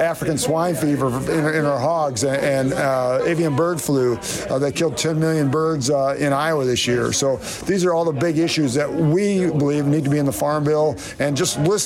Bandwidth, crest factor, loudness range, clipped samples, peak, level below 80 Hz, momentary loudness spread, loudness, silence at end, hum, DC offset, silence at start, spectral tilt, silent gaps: 16.5 kHz; 10 dB; 1 LU; under 0.1%; -10 dBFS; -48 dBFS; 3 LU; -19 LUFS; 0 s; none; under 0.1%; 0 s; -5 dB/octave; none